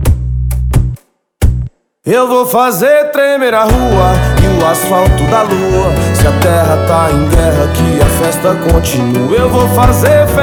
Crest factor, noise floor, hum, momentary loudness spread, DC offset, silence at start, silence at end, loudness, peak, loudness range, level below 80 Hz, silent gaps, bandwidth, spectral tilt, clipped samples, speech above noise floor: 10 dB; -30 dBFS; none; 6 LU; under 0.1%; 0 s; 0 s; -10 LUFS; 0 dBFS; 2 LU; -18 dBFS; none; over 20 kHz; -6 dB/octave; 0.8%; 21 dB